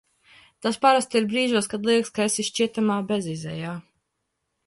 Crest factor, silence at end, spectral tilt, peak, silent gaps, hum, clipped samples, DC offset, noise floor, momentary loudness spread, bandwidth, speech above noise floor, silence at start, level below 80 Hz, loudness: 20 dB; 0.85 s; -4 dB/octave; -6 dBFS; none; none; under 0.1%; under 0.1%; -78 dBFS; 12 LU; 11.5 kHz; 55 dB; 0.6 s; -66 dBFS; -23 LUFS